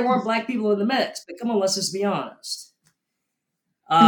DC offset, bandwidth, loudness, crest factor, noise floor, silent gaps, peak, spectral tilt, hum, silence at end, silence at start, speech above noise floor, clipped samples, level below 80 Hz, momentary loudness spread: under 0.1%; 18 kHz; -24 LUFS; 20 dB; -80 dBFS; none; -2 dBFS; -4 dB/octave; none; 0 s; 0 s; 56 dB; under 0.1%; -78 dBFS; 10 LU